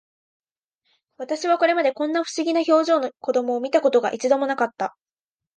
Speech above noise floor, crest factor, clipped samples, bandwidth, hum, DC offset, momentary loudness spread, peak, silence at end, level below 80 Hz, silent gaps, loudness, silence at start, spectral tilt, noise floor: over 69 dB; 16 dB; under 0.1%; 9.6 kHz; none; under 0.1%; 9 LU; -6 dBFS; 0.65 s; -80 dBFS; none; -21 LUFS; 1.2 s; -3 dB/octave; under -90 dBFS